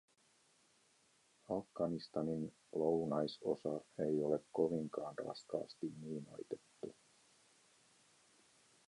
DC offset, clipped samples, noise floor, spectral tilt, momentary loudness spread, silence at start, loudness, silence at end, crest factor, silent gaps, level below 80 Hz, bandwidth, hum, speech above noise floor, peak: under 0.1%; under 0.1%; -74 dBFS; -7 dB/octave; 12 LU; 1.5 s; -41 LUFS; 1.95 s; 22 dB; none; -78 dBFS; 11.5 kHz; none; 33 dB; -22 dBFS